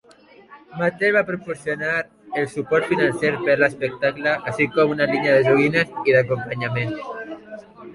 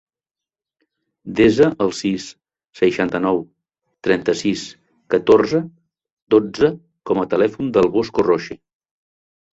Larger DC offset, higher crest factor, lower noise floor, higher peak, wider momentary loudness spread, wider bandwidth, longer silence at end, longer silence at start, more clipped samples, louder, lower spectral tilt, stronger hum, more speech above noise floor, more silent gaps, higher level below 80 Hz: neither; about the same, 18 dB vs 18 dB; second, -49 dBFS vs -89 dBFS; about the same, -4 dBFS vs -2 dBFS; about the same, 14 LU vs 15 LU; first, 11.5 kHz vs 8 kHz; second, 0 s vs 1 s; second, 0.5 s vs 1.25 s; neither; about the same, -20 LUFS vs -18 LUFS; about the same, -6.5 dB/octave vs -6 dB/octave; neither; second, 29 dB vs 72 dB; second, none vs 6.12-6.27 s; second, -58 dBFS vs -52 dBFS